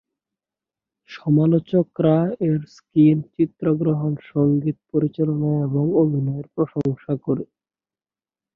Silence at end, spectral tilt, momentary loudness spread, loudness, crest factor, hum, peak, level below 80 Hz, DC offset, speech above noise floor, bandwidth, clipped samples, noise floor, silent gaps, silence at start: 1.1 s; -11 dB/octave; 9 LU; -21 LUFS; 16 dB; none; -4 dBFS; -60 dBFS; under 0.1%; over 70 dB; 5.8 kHz; under 0.1%; under -90 dBFS; none; 1.1 s